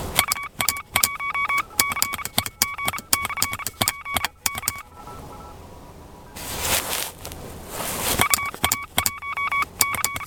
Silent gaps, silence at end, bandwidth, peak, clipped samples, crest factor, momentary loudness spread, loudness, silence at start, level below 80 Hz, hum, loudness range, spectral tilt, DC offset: none; 0 s; 17.5 kHz; 0 dBFS; under 0.1%; 26 dB; 18 LU; -23 LUFS; 0 s; -46 dBFS; none; 6 LU; -1 dB/octave; under 0.1%